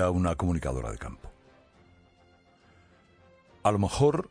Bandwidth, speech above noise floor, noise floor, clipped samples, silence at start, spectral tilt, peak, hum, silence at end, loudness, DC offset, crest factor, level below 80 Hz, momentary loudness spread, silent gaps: 10.5 kHz; 34 dB; -61 dBFS; under 0.1%; 0 s; -6.5 dB/octave; -10 dBFS; none; 0.05 s; -28 LUFS; under 0.1%; 20 dB; -44 dBFS; 17 LU; none